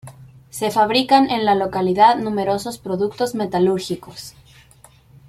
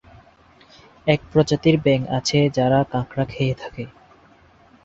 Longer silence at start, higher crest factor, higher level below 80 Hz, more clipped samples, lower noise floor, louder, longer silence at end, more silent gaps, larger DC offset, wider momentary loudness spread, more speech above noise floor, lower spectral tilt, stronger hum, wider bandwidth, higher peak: second, 0.05 s vs 1.05 s; about the same, 18 dB vs 20 dB; second, -54 dBFS vs -48 dBFS; neither; about the same, -49 dBFS vs -52 dBFS; about the same, -18 LUFS vs -20 LUFS; about the same, 1 s vs 0.95 s; neither; neither; first, 15 LU vs 12 LU; about the same, 31 dB vs 33 dB; about the same, -5 dB/octave vs -6 dB/octave; neither; first, 15.5 kHz vs 8 kHz; about the same, -2 dBFS vs -2 dBFS